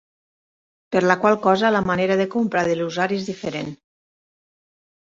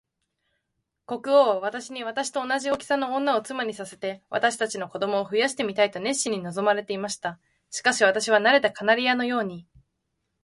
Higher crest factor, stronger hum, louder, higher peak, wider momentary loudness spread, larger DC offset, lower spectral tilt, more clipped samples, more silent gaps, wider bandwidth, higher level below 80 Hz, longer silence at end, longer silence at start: about the same, 20 dB vs 18 dB; neither; first, -20 LUFS vs -24 LUFS; first, -2 dBFS vs -6 dBFS; about the same, 11 LU vs 13 LU; neither; first, -6 dB/octave vs -3 dB/octave; neither; neither; second, 7.8 kHz vs 11.5 kHz; first, -58 dBFS vs -70 dBFS; first, 1.3 s vs 0.85 s; second, 0.9 s vs 1.1 s